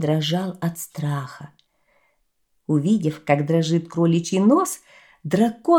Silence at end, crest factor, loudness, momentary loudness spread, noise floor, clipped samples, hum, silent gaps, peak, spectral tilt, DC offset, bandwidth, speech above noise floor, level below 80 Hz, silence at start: 0 s; 18 dB; -21 LUFS; 15 LU; -71 dBFS; under 0.1%; none; none; -4 dBFS; -6 dB/octave; under 0.1%; 17 kHz; 51 dB; -66 dBFS; 0 s